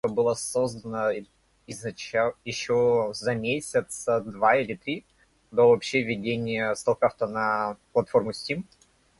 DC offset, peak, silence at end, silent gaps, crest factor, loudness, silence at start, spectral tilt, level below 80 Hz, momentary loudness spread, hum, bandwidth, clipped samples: under 0.1%; -8 dBFS; 0.55 s; none; 20 dB; -26 LUFS; 0.05 s; -4.5 dB/octave; -62 dBFS; 11 LU; none; 11.5 kHz; under 0.1%